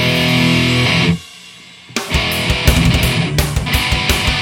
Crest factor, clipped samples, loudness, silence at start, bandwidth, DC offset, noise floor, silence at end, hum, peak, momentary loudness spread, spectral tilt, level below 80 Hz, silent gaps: 14 dB; under 0.1%; -14 LUFS; 0 s; 17.5 kHz; under 0.1%; -38 dBFS; 0 s; none; 0 dBFS; 7 LU; -4.5 dB/octave; -24 dBFS; none